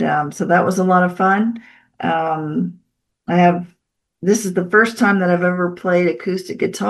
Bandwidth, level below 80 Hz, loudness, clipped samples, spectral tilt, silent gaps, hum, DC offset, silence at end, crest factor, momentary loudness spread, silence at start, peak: 12.5 kHz; -64 dBFS; -17 LUFS; under 0.1%; -6 dB/octave; none; none; under 0.1%; 0 s; 16 dB; 9 LU; 0 s; -2 dBFS